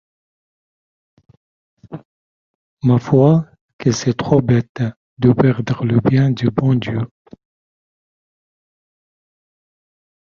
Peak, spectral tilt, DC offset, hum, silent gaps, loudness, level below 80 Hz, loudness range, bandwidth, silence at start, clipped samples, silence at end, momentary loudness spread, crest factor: 0 dBFS; -7.5 dB/octave; under 0.1%; none; 2.05-2.77 s, 3.61-3.79 s, 4.69-4.75 s, 4.97-5.17 s; -16 LUFS; -50 dBFS; 9 LU; 7.2 kHz; 1.9 s; under 0.1%; 3.2 s; 17 LU; 18 dB